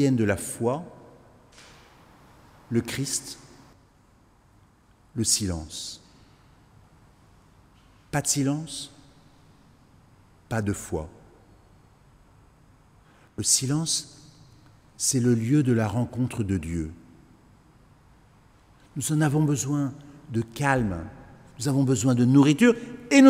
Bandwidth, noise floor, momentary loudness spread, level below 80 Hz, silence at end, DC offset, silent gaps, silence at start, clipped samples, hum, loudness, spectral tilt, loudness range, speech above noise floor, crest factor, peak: 16 kHz; -59 dBFS; 16 LU; -52 dBFS; 0 s; under 0.1%; none; 0 s; under 0.1%; none; -25 LUFS; -4.5 dB/octave; 9 LU; 35 dB; 24 dB; -2 dBFS